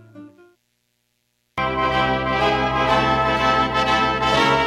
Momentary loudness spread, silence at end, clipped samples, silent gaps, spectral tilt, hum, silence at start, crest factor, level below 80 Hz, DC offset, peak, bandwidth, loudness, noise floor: 4 LU; 0 s; under 0.1%; none; -5 dB/octave; 60 Hz at -60 dBFS; 0.15 s; 16 dB; -38 dBFS; under 0.1%; -4 dBFS; 14 kHz; -19 LUFS; -70 dBFS